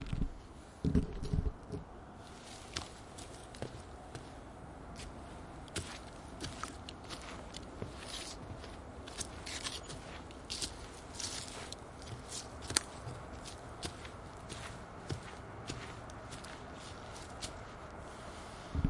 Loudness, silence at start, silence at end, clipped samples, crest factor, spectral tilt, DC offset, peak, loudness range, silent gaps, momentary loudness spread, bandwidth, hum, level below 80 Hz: -44 LUFS; 0 s; 0 s; under 0.1%; 34 dB; -4 dB/octave; under 0.1%; -10 dBFS; 7 LU; none; 11 LU; 12 kHz; none; -50 dBFS